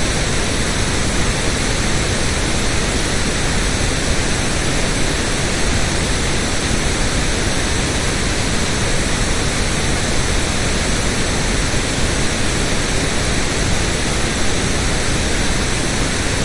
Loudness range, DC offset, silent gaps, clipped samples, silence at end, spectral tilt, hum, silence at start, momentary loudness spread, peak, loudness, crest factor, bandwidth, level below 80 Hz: 0 LU; under 0.1%; none; under 0.1%; 0 s; -3.5 dB/octave; none; 0 s; 0 LU; -4 dBFS; -18 LUFS; 14 dB; 11.5 kHz; -22 dBFS